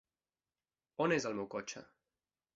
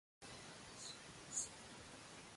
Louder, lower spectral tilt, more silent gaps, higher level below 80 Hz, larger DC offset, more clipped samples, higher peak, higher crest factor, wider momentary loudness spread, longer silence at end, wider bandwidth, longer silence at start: first, -37 LUFS vs -50 LUFS; first, -4 dB/octave vs -1.5 dB/octave; neither; about the same, -78 dBFS vs -74 dBFS; neither; neither; first, -18 dBFS vs -28 dBFS; about the same, 22 dB vs 26 dB; first, 17 LU vs 11 LU; first, 0.7 s vs 0 s; second, 8 kHz vs 11.5 kHz; first, 1 s vs 0.2 s